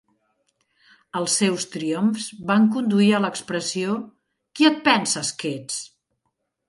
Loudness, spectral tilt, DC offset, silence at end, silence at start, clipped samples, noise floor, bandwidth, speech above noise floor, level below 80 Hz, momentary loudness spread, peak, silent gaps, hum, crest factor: -22 LUFS; -4 dB/octave; under 0.1%; 0.8 s; 1.15 s; under 0.1%; -76 dBFS; 11.5 kHz; 55 dB; -70 dBFS; 12 LU; -2 dBFS; none; none; 22 dB